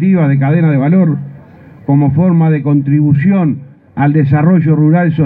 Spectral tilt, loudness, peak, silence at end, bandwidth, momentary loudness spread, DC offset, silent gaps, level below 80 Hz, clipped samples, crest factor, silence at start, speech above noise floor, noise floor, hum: -13 dB/octave; -11 LUFS; 0 dBFS; 0 s; 3.9 kHz; 9 LU; under 0.1%; none; -46 dBFS; under 0.1%; 10 dB; 0 s; 27 dB; -36 dBFS; none